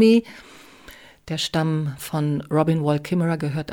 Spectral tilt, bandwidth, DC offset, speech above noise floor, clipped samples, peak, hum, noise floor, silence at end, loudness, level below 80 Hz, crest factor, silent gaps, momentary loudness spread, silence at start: -6.5 dB/octave; 17.5 kHz; under 0.1%; 25 dB; under 0.1%; -6 dBFS; none; -46 dBFS; 0 s; -23 LUFS; -56 dBFS; 16 dB; none; 8 LU; 0 s